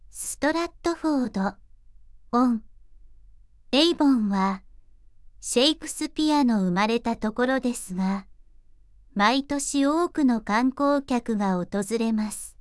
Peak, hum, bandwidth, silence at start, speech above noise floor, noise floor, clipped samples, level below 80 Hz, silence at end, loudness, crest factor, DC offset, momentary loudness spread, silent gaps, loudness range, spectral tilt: -6 dBFS; none; 12 kHz; 0.15 s; 29 dB; -52 dBFS; under 0.1%; -52 dBFS; 0.1 s; -24 LUFS; 20 dB; under 0.1%; 8 LU; none; 3 LU; -4.5 dB/octave